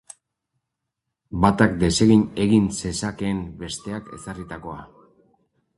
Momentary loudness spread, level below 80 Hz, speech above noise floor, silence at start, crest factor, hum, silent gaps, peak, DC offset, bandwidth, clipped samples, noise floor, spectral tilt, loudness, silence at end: 18 LU; -42 dBFS; 60 dB; 1.3 s; 22 dB; none; none; -2 dBFS; under 0.1%; 11.5 kHz; under 0.1%; -82 dBFS; -5.5 dB/octave; -21 LUFS; 0.95 s